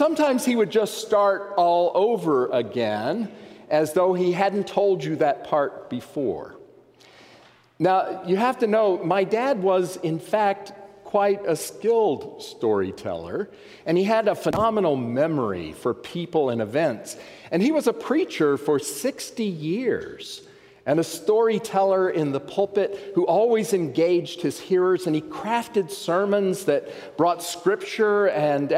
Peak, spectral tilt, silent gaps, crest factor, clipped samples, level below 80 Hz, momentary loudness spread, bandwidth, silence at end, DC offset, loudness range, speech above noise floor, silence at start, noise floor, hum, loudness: -6 dBFS; -5.5 dB/octave; none; 16 dB; under 0.1%; -64 dBFS; 9 LU; 16 kHz; 0 s; under 0.1%; 3 LU; 30 dB; 0 s; -53 dBFS; none; -23 LUFS